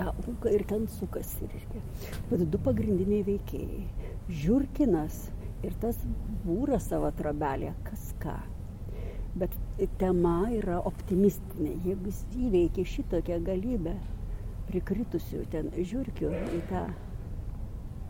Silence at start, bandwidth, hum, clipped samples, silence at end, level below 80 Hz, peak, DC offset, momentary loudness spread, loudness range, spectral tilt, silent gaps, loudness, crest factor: 0 s; 17 kHz; none; under 0.1%; 0 s; -38 dBFS; -14 dBFS; under 0.1%; 13 LU; 5 LU; -8 dB/octave; none; -32 LUFS; 18 dB